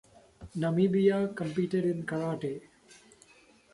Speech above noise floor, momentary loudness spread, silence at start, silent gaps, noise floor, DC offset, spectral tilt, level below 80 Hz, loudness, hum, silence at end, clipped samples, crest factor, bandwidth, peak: 32 dB; 12 LU; 0.4 s; none; -60 dBFS; under 0.1%; -8 dB/octave; -64 dBFS; -30 LUFS; none; 1.15 s; under 0.1%; 18 dB; 11.5 kHz; -14 dBFS